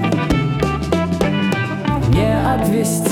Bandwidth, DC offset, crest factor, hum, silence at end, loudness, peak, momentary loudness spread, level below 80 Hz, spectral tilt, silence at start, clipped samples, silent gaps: 18 kHz; under 0.1%; 14 dB; none; 0 s; -17 LUFS; -4 dBFS; 4 LU; -30 dBFS; -6 dB/octave; 0 s; under 0.1%; none